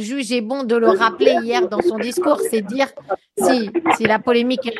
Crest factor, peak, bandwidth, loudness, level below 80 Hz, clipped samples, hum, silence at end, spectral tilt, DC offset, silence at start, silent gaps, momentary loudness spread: 18 dB; 0 dBFS; 12.5 kHz; -18 LUFS; -62 dBFS; under 0.1%; none; 0 s; -4 dB/octave; under 0.1%; 0 s; none; 7 LU